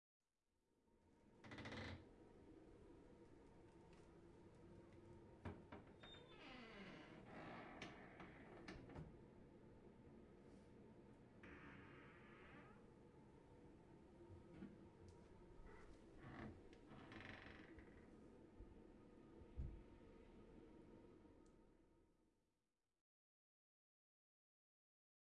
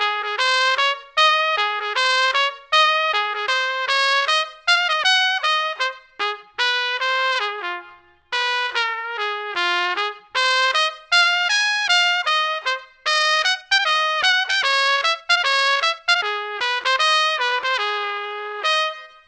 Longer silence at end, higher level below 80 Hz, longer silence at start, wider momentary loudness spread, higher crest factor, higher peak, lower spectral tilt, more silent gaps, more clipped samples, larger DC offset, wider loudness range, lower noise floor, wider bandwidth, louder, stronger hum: first, 3 s vs 0.2 s; about the same, -72 dBFS vs -68 dBFS; first, 0.7 s vs 0 s; about the same, 10 LU vs 9 LU; about the same, 22 dB vs 18 dB; second, -42 dBFS vs -2 dBFS; first, -6 dB/octave vs 2 dB/octave; neither; neither; neither; about the same, 5 LU vs 5 LU; first, under -90 dBFS vs -47 dBFS; first, 9.6 kHz vs 8 kHz; second, -63 LUFS vs -18 LUFS; neither